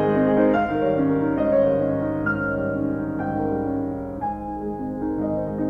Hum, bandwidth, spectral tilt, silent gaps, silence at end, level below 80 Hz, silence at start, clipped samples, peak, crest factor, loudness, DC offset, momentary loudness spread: none; 4.5 kHz; -10 dB/octave; none; 0 s; -44 dBFS; 0 s; under 0.1%; -8 dBFS; 14 dB; -23 LUFS; under 0.1%; 10 LU